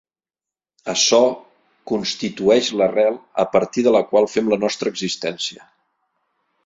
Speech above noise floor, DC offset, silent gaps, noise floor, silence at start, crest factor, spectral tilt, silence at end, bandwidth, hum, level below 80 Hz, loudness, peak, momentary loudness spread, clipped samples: over 72 dB; under 0.1%; none; under -90 dBFS; 0.85 s; 18 dB; -3 dB/octave; 1.1 s; 7.8 kHz; none; -62 dBFS; -19 LUFS; -2 dBFS; 10 LU; under 0.1%